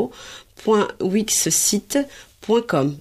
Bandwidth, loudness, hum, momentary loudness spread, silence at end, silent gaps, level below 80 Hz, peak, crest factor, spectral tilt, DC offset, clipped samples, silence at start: 15.5 kHz; -20 LUFS; none; 17 LU; 0 s; none; -56 dBFS; -6 dBFS; 16 dB; -3.5 dB/octave; under 0.1%; under 0.1%; 0 s